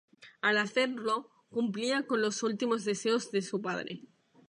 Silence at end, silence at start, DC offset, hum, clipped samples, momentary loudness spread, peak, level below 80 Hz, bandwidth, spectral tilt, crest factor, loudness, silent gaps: 0.45 s; 0.2 s; under 0.1%; none; under 0.1%; 8 LU; -16 dBFS; -84 dBFS; 11 kHz; -3.5 dB/octave; 16 dB; -31 LUFS; none